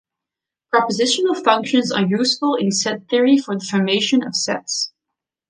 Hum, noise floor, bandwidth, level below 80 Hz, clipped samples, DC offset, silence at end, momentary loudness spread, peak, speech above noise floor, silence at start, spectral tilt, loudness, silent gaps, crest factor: none; -86 dBFS; 10 kHz; -68 dBFS; under 0.1%; under 0.1%; 0.6 s; 5 LU; -2 dBFS; 68 dB; 0.75 s; -3.5 dB/octave; -18 LUFS; none; 18 dB